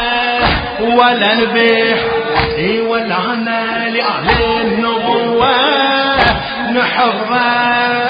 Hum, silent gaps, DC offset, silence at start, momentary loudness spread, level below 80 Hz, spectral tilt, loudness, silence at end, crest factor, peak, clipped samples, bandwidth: none; none; under 0.1%; 0 s; 5 LU; -32 dBFS; -7 dB/octave; -13 LUFS; 0 s; 14 dB; 0 dBFS; under 0.1%; 5.2 kHz